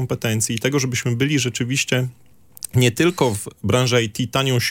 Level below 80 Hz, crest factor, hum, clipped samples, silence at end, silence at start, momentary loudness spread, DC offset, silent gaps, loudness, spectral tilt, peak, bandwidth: -54 dBFS; 18 dB; none; under 0.1%; 0 s; 0 s; 5 LU; under 0.1%; none; -20 LUFS; -4.5 dB/octave; -2 dBFS; 17 kHz